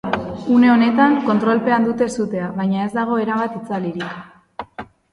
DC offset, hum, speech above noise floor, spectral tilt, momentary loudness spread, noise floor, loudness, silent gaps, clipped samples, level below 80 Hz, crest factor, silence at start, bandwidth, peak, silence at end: under 0.1%; none; 20 dB; -6.5 dB/octave; 21 LU; -37 dBFS; -18 LUFS; none; under 0.1%; -54 dBFS; 18 dB; 0.05 s; 11 kHz; 0 dBFS; 0.3 s